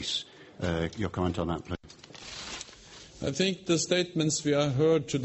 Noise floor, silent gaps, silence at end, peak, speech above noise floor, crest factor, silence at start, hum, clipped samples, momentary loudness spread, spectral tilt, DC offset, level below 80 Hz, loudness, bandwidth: -50 dBFS; none; 0 s; -10 dBFS; 22 dB; 20 dB; 0 s; none; under 0.1%; 19 LU; -4.5 dB/octave; under 0.1%; -52 dBFS; -29 LUFS; 8.4 kHz